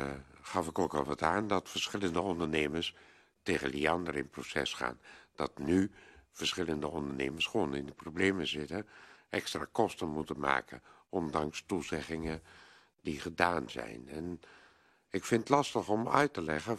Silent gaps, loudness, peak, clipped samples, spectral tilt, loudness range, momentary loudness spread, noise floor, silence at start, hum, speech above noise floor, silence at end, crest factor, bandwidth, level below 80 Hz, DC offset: none; -34 LUFS; -8 dBFS; under 0.1%; -4.5 dB/octave; 3 LU; 12 LU; -65 dBFS; 0 s; none; 31 dB; 0 s; 26 dB; 13 kHz; -62 dBFS; under 0.1%